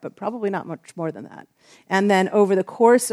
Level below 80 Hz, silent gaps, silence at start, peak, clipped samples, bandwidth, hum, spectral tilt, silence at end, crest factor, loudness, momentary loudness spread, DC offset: -76 dBFS; none; 0.05 s; -2 dBFS; under 0.1%; 15 kHz; none; -5 dB/octave; 0 s; 18 dB; -21 LUFS; 16 LU; under 0.1%